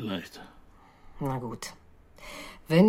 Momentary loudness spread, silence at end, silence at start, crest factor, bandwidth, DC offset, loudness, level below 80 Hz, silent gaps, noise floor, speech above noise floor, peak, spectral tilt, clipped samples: 19 LU; 0 s; 0 s; 22 dB; 16 kHz; under 0.1%; -35 LUFS; -54 dBFS; none; -53 dBFS; 25 dB; -8 dBFS; -6.5 dB/octave; under 0.1%